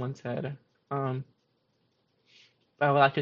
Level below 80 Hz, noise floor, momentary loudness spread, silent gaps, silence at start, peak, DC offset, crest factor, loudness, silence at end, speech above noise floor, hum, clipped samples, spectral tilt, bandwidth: -74 dBFS; -73 dBFS; 20 LU; none; 0 s; -8 dBFS; under 0.1%; 24 dB; -30 LUFS; 0 s; 45 dB; none; under 0.1%; -4.5 dB/octave; 7.2 kHz